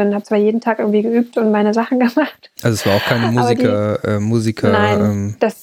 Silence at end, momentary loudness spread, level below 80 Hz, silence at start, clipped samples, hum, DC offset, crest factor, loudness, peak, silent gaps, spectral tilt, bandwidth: 0.1 s; 4 LU; -58 dBFS; 0 s; under 0.1%; none; under 0.1%; 14 dB; -16 LUFS; -2 dBFS; none; -6.5 dB/octave; 18 kHz